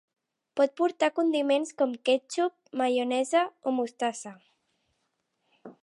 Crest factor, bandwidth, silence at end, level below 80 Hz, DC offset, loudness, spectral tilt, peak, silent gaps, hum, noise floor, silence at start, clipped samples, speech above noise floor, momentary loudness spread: 18 dB; 11.5 kHz; 0.1 s; -88 dBFS; under 0.1%; -28 LUFS; -3 dB/octave; -12 dBFS; none; none; -78 dBFS; 0.55 s; under 0.1%; 51 dB; 6 LU